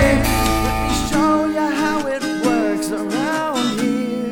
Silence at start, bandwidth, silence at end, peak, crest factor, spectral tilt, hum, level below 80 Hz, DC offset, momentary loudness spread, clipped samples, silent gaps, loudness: 0 s; 19.5 kHz; 0 s; -2 dBFS; 16 dB; -5 dB/octave; none; -30 dBFS; under 0.1%; 5 LU; under 0.1%; none; -19 LUFS